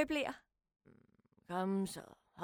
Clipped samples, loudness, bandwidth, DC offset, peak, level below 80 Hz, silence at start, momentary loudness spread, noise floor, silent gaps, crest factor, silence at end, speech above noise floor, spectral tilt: under 0.1%; -40 LUFS; 18.5 kHz; under 0.1%; -18 dBFS; -70 dBFS; 0 s; 17 LU; -72 dBFS; none; 22 dB; 0 s; 33 dB; -5.5 dB/octave